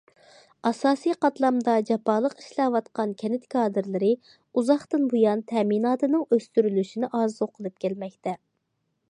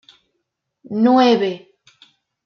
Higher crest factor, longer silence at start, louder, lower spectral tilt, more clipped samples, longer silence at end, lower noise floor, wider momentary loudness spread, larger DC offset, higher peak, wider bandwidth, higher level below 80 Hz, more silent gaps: about the same, 18 dB vs 18 dB; second, 0.65 s vs 0.9 s; second, -25 LUFS vs -16 LUFS; about the same, -6.5 dB/octave vs -6 dB/octave; neither; second, 0.75 s vs 0.9 s; about the same, -76 dBFS vs -75 dBFS; second, 8 LU vs 16 LU; neither; second, -8 dBFS vs -2 dBFS; first, 11 kHz vs 6.8 kHz; second, -78 dBFS vs -72 dBFS; neither